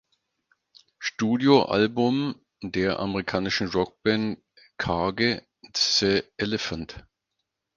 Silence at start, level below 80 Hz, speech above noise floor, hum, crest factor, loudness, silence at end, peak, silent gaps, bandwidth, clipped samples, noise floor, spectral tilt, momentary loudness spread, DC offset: 1 s; -52 dBFS; 57 dB; none; 22 dB; -25 LUFS; 0.75 s; -4 dBFS; none; 7.4 kHz; under 0.1%; -81 dBFS; -4.5 dB/octave; 13 LU; under 0.1%